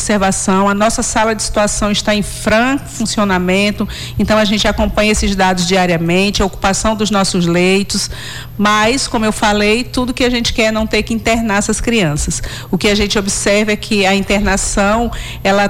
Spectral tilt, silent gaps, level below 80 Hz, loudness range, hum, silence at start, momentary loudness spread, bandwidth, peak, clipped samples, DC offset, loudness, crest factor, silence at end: -4 dB/octave; none; -28 dBFS; 1 LU; none; 0 s; 6 LU; 16 kHz; -4 dBFS; under 0.1%; under 0.1%; -13 LUFS; 10 dB; 0 s